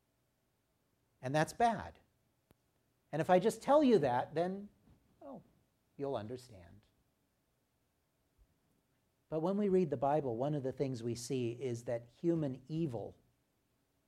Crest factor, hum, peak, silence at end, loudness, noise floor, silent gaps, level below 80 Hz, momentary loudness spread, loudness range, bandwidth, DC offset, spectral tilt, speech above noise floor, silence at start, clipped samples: 22 dB; none; -16 dBFS; 0.95 s; -35 LUFS; -80 dBFS; none; -72 dBFS; 17 LU; 15 LU; 15 kHz; under 0.1%; -6.5 dB/octave; 45 dB; 1.2 s; under 0.1%